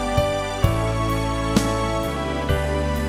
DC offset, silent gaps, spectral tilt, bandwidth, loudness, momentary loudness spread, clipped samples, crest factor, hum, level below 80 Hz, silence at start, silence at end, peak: 0.1%; none; -5.5 dB/octave; 16 kHz; -22 LUFS; 3 LU; under 0.1%; 18 dB; none; -28 dBFS; 0 s; 0 s; -4 dBFS